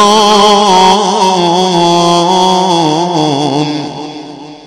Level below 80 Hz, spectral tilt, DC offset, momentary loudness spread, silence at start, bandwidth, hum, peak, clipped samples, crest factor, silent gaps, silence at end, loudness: -48 dBFS; -4 dB/octave; under 0.1%; 15 LU; 0 s; 15.5 kHz; none; 0 dBFS; 1%; 8 dB; none; 0 s; -8 LUFS